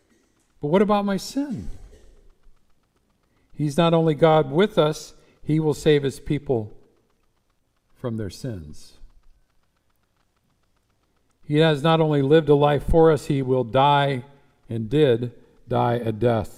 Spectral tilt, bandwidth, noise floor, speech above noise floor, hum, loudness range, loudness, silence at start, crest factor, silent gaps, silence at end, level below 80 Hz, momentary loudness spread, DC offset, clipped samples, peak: -7 dB/octave; 14.5 kHz; -68 dBFS; 48 dB; none; 18 LU; -21 LUFS; 0.6 s; 20 dB; none; 0.05 s; -42 dBFS; 16 LU; under 0.1%; under 0.1%; -4 dBFS